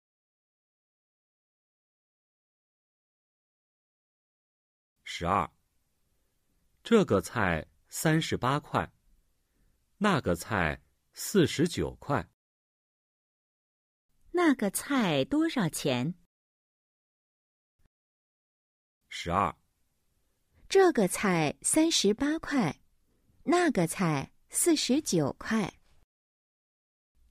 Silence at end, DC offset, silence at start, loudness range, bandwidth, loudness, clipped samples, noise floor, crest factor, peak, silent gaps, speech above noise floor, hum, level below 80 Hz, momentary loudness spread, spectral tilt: 1.6 s; under 0.1%; 5.05 s; 10 LU; 15.5 kHz; -28 LUFS; under 0.1%; -74 dBFS; 20 dB; -10 dBFS; 12.34-14.09 s, 16.26-17.79 s, 17.87-19.01 s; 46 dB; none; -58 dBFS; 13 LU; -4.5 dB/octave